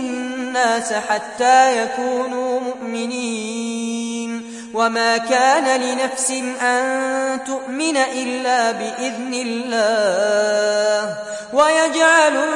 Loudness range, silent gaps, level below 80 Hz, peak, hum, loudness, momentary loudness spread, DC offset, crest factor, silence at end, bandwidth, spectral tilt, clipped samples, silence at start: 3 LU; none; -66 dBFS; -2 dBFS; none; -18 LUFS; 11 LU; under 0.1%; 16 dB; 0 s; 11.5 kHz; -2 dB/octave; under 0.1%; 0 s